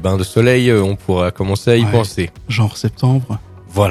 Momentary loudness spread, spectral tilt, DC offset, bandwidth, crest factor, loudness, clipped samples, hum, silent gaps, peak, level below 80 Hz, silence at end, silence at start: 10 LU; -6.5 dB/octave; under 0.1%; 13.5 kHz; 14 dB; -15 LUFS; 0.1%; none; none; 0 dBFS; -42 dBFS; 0 s; 0 s